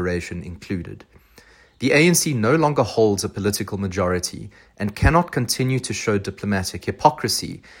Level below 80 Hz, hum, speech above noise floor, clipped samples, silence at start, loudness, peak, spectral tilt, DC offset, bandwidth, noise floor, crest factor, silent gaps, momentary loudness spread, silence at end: -38 dBFS; none; 30 dB; under 0.1%; 0 s; -21 LUFS; 0 dBFS; -4.5 dB/octave; under 0.1%; 16.5 kHz; -51 dBFS; 20 dB; none; 13 LU; 0.2 s